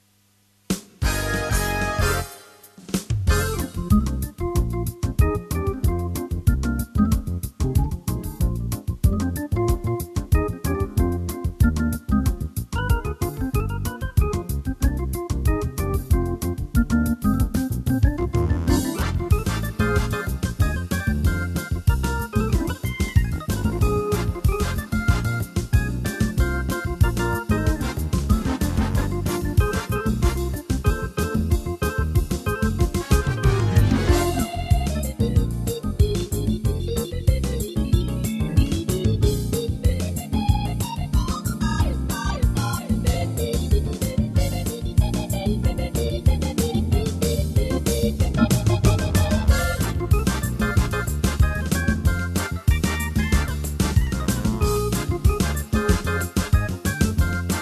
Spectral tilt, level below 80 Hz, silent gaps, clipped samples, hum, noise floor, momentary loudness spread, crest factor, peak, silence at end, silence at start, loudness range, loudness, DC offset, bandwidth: -6 dB/octave; -26 dBFS; none; under 0.1%; none; -61 dBFS; 5 LU; 18 dB; -4 dBFS; 0 s; 0.7 s; 3 LU; -23 LUFS; under 0.1%; 14 kHz